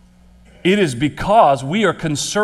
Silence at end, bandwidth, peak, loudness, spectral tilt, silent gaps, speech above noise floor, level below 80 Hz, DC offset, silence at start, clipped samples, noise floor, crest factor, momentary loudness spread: 0 s; 14 kHz; 0 dBFS; -16 LUFS; -4.5 dB/octave; none; 31 dB; -42 dBFS; under 0.1%; 0.65 s; under 0.1%; -47 dBFS; 16 dB; 8 LU